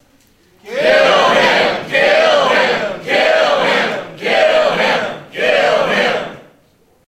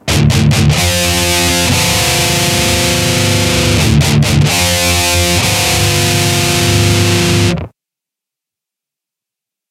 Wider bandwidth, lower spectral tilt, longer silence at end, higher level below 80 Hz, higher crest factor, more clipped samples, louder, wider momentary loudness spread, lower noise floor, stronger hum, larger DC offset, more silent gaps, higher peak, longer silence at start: second, 14.5 kHz vs 16.5 kHz; about the same, -3 dB/octave vs -3.5 dB/octave; second, 0.7 s vs 2 s; second, -52 dBFS vs -26 dBFS; about the same, 14 dB vs 12 dB; neither; second, -13 LUFS vs -10 LUFS; first, 9 LU vs 1 LU; second, -53 dBFS vs -84 dBFS; neither; neither; neither; about the same, 0 dBFS vs 0 dBFS; first, 0.65 s vs 0.05 s